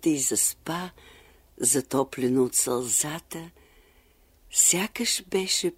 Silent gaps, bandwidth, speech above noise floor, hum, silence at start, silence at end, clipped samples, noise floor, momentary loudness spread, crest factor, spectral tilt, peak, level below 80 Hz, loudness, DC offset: none; 16 kHz; 34 dB; none; 0 s; 0.05 s; under 0.1%; -60 dBFS; 14 LU; 18 dB; -2.5 dB/octave; -8 dBFS; -60 dBFS; -24 LUFS; under 0.1%